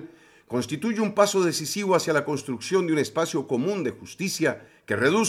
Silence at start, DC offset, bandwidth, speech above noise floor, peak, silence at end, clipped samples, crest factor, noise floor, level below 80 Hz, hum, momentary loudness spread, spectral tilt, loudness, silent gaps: 0 s; under 0.1%; 16 kHz; 23 dB; -4 dBFS; 0 s; under 0.1%; 20 dB; -47 dBFS; -70 dBFS; none; 9 LU; -4.5 dB/octave; -25 LUFS; none